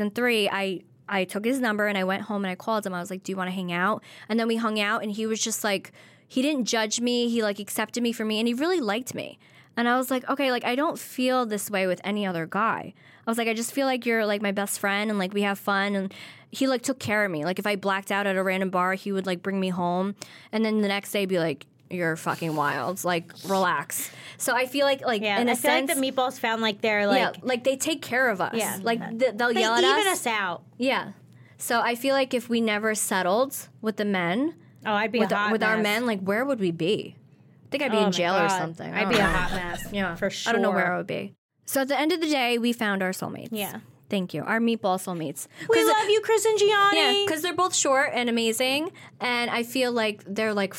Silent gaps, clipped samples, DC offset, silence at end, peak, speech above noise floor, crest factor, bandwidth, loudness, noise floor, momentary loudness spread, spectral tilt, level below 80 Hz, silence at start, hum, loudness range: 41.38-41.49 s; under 0.1%; under 0.1%; 0 s; -8 dBFS; 28 dB; 18 dB; 17 kHz; -25 LUFS; -54 dBFS; 9 LU; -3.5 dB/octave; -52 dBFS; 0 s; none; 5 LU